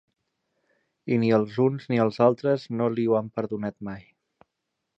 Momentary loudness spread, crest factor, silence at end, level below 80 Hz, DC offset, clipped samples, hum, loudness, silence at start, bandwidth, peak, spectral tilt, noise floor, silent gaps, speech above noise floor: 16 LU; 20 dB; 1 s; -66 dBFS; under 0.1%; under 0.1%; none; -25 LUFS; 1.05 s; 7.6 kHz; -6 dBFS; -9 dB/octave; -81 dBFS; none; 57 dB